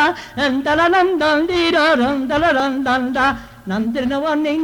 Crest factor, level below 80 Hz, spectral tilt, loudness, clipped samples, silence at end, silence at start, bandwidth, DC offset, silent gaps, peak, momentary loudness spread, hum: 12 dB; -44 dBFS; -5 dB/octave; -17 LUFS; under 0.1%; 0 s; 0 s; 18.5 kHz; under 0.1%; none; -6 dBFS; 6 LU; none